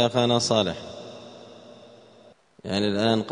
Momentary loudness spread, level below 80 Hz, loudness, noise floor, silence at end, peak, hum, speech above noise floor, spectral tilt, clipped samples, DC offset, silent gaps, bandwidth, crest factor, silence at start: 23 LU; -62 dBFS; -24 LUFS; -54 dBFS; 0 s; -6 dBFS; none; 31 dB; -4.5 dB/octave; under 0.1%; under 0.1%; none; 10.5 kHz; 20 dB; 0 s